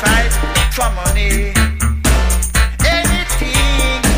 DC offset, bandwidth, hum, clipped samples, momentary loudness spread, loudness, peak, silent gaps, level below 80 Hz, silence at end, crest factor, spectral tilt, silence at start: under 0.1%; 16.5 kHz; none; under 0.1%; 3 LU; -14 LUFS; -2 dBFS; none; -16 dBFS; 0 s; 12 dB; -3.5 dB/octave; 0 s